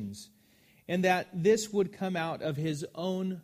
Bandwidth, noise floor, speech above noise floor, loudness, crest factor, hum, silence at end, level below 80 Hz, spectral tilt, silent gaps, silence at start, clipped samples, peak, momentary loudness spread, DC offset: 15.5 kHz; -63 dBFS; 33 dB; -30 LUFS; 18 dB; none; 0 s; -70 dBFS; -5.5 dB/octave; none; 0 s; under 0.1%; -12 dBFS; 8 LU; under 0.1%